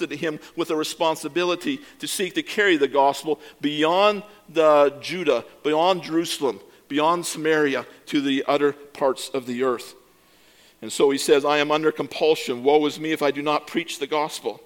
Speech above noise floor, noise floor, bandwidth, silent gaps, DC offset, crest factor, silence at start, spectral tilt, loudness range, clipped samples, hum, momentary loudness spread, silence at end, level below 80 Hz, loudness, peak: 33 dB; -55 dBFS; 17.5 kHz; none; under 0.1%; 18 dB; 0 s; -3.5 dB/octave; 3 LU; under 0.1%; none; 10 LU; 0.1 s; -70 dBFS; -22 LUFS; -4 dBFS